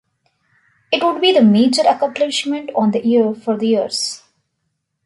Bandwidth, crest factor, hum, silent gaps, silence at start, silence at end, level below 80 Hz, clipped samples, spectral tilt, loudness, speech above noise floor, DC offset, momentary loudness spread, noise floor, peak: 11.5 kHz; 14 dB; none; none; 0.9 s; 0.9 s; -64 dBFS; under 0.1%; -4.5 dB/octave; -16 LUFS; 57 dB; under 0.1%; 9 LU; -72 dBFS; -2 dBFS